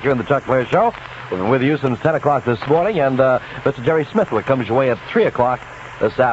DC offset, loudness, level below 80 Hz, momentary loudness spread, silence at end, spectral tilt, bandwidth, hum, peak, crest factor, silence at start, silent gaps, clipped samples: under 0.1%; -18 LUFS; -48 dBFS; 7 LU; 0 s; -8 dB/octave; 8 kHz; none; -2 dBFS; 16 dB; 0 s; none; under 0.1%